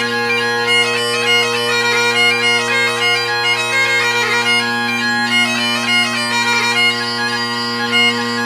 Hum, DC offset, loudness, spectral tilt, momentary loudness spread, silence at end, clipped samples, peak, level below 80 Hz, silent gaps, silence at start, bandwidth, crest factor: none; under 0.1%; -13 LUFS; -2 dB/octave; 4 LU; 0 s; under 0.1%; -2 dBFS; -62 dBFS; none; 0 s; 16 kHz; 14 dB